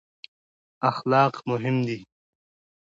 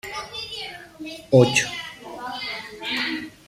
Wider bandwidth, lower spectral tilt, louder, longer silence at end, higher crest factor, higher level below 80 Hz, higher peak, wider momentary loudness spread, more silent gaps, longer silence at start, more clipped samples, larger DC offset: second, 7.6 kHz vs 15.5 kHz; first, -7.5 dB/octave vs -4.5 dB/octave; about the same, -24 LUFS vs -23 LUFS; first, 0.95 s vs 0.1 s; about the same, 20 dB vs 22 dB; second, -70 dBFS vs -58 dBFS; second, -8 dBFS vs -2 dBFS; second, 9 LU vs 19 LU; neither; first, 0.8 s vs 0.05 s; neither; neither